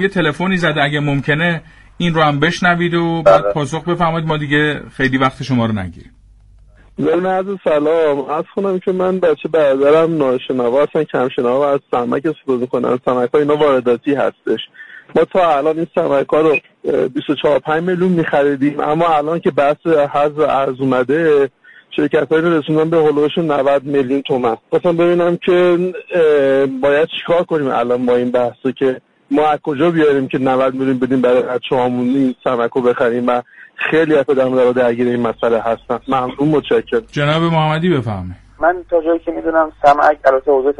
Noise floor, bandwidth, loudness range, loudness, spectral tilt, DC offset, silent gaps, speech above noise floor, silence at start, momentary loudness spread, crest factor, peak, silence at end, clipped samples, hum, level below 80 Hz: -45 dBFS; 10.5 kHz; 2 LU; -15 LUFS; -7 dB/octave; under 0.1%; none; 30 dB; 0 s; 6 LU; 14 dB; 0 dBFS; 0.05 s; under 0.1%; none; -48 dBFS